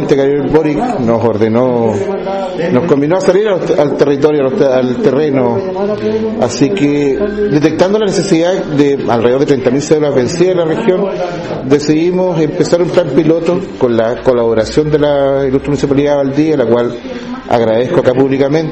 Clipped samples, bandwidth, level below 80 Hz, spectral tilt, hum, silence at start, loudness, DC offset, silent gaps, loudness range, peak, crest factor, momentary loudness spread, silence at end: 0.6%; 8.6 kHz; -40 dBFS; -6.5 dB/octave; none; 0 s; -12 LUFS; under 0.1%; none; 1 LU; 0 dBFS; 10 dB; 4 LU; 0 s